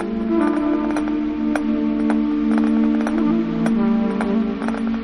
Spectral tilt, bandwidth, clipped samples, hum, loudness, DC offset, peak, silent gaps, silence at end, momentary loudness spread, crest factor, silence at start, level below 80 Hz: -7.5 dB/octave; 10 kHz; under 0.1%; none; -20 LUFS; under 0.1%; -6 dBFS; none; 0 s; 4 LU; 12 dB; 0 s; -42 dBFS